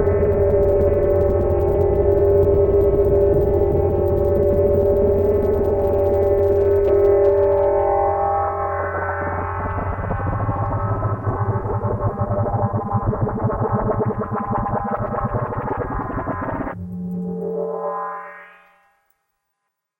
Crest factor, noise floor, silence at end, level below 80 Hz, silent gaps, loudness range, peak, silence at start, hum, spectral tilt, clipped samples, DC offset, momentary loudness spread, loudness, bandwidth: 14 dB; -77 dBFS; 1.55 s; -32 dBFS; none; 9 LU; -4 dBFS; 0 s; none; -11 dB/octave; under 0.1%; under 0.1%; 9 LU; -19 LUFS; 17 kHz